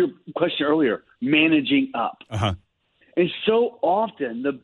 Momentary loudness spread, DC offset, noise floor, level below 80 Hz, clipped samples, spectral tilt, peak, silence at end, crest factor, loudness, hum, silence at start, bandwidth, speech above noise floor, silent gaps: 10 LU; under 0.1%; -62 dBFS; -56 dBFS; under 0.1%; -7 dB/octave; -6 dBFS; 0.05 s; 18 dB; -22 LUFS; none; 0 s; 10.5 kHz; 41 dB; none